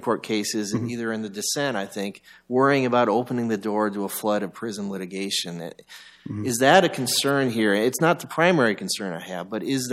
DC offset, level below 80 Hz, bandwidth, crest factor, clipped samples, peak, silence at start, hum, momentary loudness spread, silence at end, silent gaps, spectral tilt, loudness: under 0.1%; -70 dBFS; 16 kHz; 20 dB; under 0.1%; -4 dBFS; 0 s; none; 12 LU; 0 s; none; -4 dB/octave; -23 LUFS